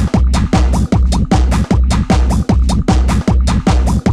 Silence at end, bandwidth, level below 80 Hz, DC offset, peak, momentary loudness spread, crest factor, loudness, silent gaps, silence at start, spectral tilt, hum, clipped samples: 0 s; 11.5 kHz; -14 dBFS; under 0.1%; 0 dBFS; 1 LU; 10 dB; -13 LUFS; none; 0 s; -6.5 dB/octave; none; under 0.1%